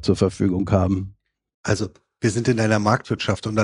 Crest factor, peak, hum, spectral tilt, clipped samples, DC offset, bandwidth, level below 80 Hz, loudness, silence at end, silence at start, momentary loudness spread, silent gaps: 18 dB; -2 dBFS; none; -6 dB/octave; under 0.1%; under 0.1%; 11 kHz; -46 dBFS; -22 LUFS; 0 s; 0 s; 8 LU; 1.54-1.64 s